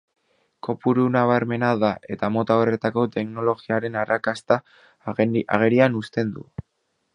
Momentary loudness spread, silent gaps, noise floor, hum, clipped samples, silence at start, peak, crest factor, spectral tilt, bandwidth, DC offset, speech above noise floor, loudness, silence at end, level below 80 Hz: 11 LU; none; -44 dBFS; none; under 0.1%; 0.65 s; 0 dBFS; 22 dB; -8 dB/octave; 10.5 kHz; under 0.1%; 22 dB; -22 LUFS; 0.7 s; -58 dBFS